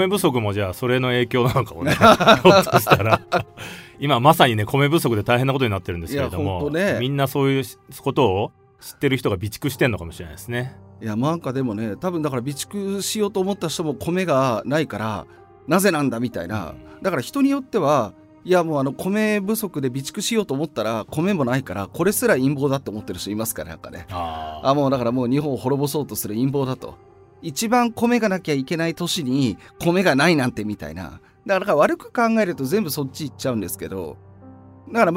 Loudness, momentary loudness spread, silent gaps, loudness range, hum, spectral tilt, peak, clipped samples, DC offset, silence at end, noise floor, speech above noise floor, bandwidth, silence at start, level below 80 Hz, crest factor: -21 LUFS; 13 LU; none; 8 LU; none; -5.5 dB/octave; 0 dBFS; under 0.1%; under 0.1%; 0 s; -44 dBFS; 23 dB; 16 kHz; 0 s; -50 dBFS; 20 dB